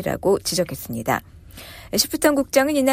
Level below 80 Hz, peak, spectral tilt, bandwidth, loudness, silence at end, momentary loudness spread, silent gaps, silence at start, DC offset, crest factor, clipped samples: -46 dBFS; -4 dBFS; -3.5 dB/octave; 16 kHz; -21 LUFS; 0 s; 16 LU; none; 0 s; under 0.1%; 18 dB; under 0.1%